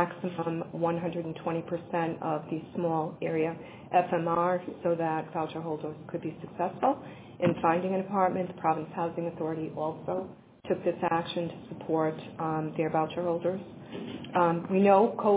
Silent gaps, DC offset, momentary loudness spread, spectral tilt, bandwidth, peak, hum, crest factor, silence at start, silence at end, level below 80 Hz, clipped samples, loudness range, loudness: none; under 0.1%; 10 LU; -6 dB/octave; 4 kHz; -10 dBFS; none; 20 dB; 0 s; 0 s; -66 dBFS; under 0.1%; 3 LU; -30 LUFS